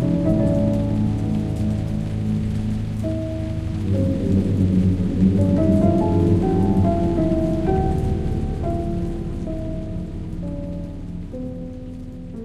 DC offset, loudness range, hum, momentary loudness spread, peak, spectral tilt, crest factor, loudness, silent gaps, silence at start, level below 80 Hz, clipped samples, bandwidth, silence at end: under 0.1%; 9 LU; none; 13 LU; -6 dBFS; -9.5 dB/octave; 14 dB; -21 LUFS; none; 0 s; -30 dBFS; under 0.1%; 10.5 kHz; 0 s